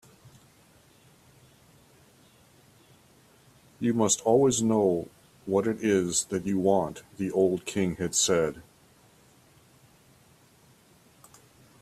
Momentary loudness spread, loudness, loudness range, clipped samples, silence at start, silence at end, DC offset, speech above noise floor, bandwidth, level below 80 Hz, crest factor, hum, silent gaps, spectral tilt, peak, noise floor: 10 LU; -26 LUFS; 7 LU; under 0.1%; 0.25 s; 3.2 s; under 0.1%; 34 dB; 14.5 kHz; -64 dBFS; 20 dB; none; none; -4.5 dB/octave; -10 dBFS; -59 dBFS